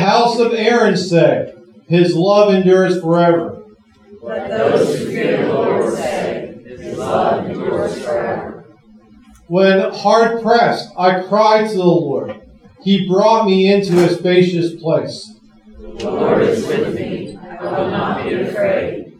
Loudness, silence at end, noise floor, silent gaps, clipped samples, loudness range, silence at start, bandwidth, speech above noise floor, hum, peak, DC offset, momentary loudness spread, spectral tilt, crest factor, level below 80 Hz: -15 LUFS; 0.1 s; -45 dBFS; none; under 0.1%; 6 LU; 0 s; 12.5 kHz; 31 dB; none; 0 dBFS; under 0.1%; 15 LU; -6.5 dB/octave; 14 dB; -52 dBFS